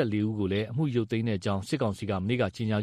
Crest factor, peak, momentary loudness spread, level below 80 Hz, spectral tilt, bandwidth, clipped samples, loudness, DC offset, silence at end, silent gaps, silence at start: 14 dB; -14 dBFS; 2 LU; -60 dBFS; -7 dB/octave; 13.5 kHz; under 0.1%; -29 LUFS; under 0.1%; 0 s; none; 0 s